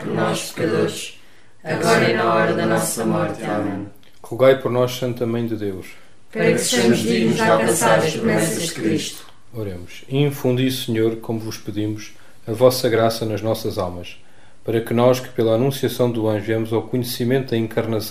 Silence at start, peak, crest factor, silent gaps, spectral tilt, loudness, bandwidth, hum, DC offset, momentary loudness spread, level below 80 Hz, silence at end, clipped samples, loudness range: 0 s; 0 dBFS; 20 dB; none; -5 dB/octave; -20 LUFS; 16 kHz; none; 1%; 15 LU; -56 dBFS; 0 s; under 0.1%; 4 LU